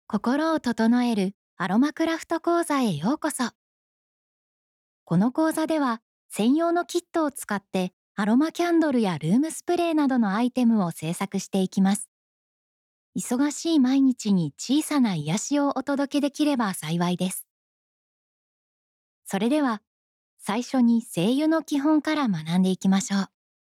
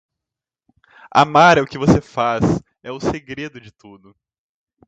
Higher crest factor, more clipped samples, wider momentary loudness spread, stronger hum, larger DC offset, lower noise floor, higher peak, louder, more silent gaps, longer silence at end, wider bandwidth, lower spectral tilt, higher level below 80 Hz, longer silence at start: second, 12 dB vs 20 dB; neither; second, 8 LU vs 19 LU; neither; neither; first, under -90 dBFS vs -86 dBFS; second, -14 dBFS vs 0 dBFS; second, -24 LUFS vs -16 LUFS; first, 1.34-1.57 s, 3.55-5.06 s, 6.02-6.29 s, 7.93-8.15 s, 12.08-13.13 s, 17.50-19.22 s, 19.87-20.37 s vs none; second, 0.45 s vs 1 s; first, 15.5 kHz vs 9 kHz; about the same, -5.5 dB/octave vs -6 dB/octave; second, -74 dBFS vs -42 dBFS; second, 0.1 s vs 1.15 s